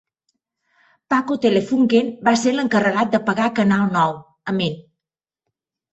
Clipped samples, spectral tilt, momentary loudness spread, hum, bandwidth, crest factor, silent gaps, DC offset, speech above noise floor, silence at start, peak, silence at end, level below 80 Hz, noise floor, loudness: under 0.1%; -5.5 dB/octave; 6 LU; none; 8.2 kHz; 18 dB; none; under 0.1%; 70 dB; 1.1 s; -2 dBFS; 1.1 s; -60 dBFS; -88 dBFS; -19 LUFS